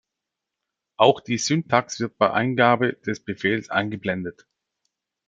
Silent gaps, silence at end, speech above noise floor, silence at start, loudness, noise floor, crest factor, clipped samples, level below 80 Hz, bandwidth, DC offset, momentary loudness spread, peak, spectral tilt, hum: none; 0.95 s; 63 dB; 1 s; -22 LUFS; -85 dBFS; 22 dB; under 0.1%; -66 dBFS; 9.4 kHz; under 0.1%; 11 LU; -2 dBFS; -4.5 dB/octave; none